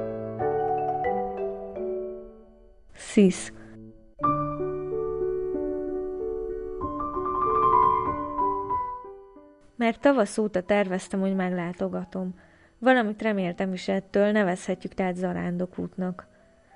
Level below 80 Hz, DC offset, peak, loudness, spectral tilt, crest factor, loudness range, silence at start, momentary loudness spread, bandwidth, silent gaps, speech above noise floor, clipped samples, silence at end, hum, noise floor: -52 dBFS; under 0.1%; -8 dBFS; -27 LUFS; -6.5 dB/octave; 20 dB; 4 LU; 0 s; 12 LU; 11 kHz; none; 27 dB; under 0.1%; 0.55 s; none; -52 dBFS